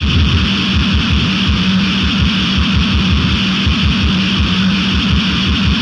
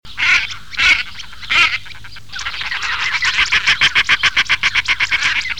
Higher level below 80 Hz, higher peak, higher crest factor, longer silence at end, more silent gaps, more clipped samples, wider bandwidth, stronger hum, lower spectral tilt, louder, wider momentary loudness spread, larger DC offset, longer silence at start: first, -22 dBFS vs -42 dBFS; about the same, -2 dBFS vs 0 dBFS; about the same, 12 dB vs 16 dB; about the same, 0 s vs 0 s; neither; neither; second, 10 kHz vs 18.5 kHz; neither; first, -5.5 dB/octave vs 0.5 dB/octave; about the same, -13 LUFS vs -14 LUFS; second, 1 LU vs 13 LU; second, under 0.1% vs 3%; about the same, 0 s vs 0 s